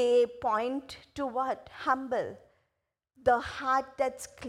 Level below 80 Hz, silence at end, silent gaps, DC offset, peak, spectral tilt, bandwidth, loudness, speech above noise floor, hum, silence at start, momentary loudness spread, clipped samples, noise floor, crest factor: -62 dBFS; 0 s; none; under 0.1%; -12 dBFS; -4 dB/octave; 13.5 kHz; -31 LUFS; 53 dB; none; 0 s; 9 LU; under 0.1%; -83 dBFS; 18 dB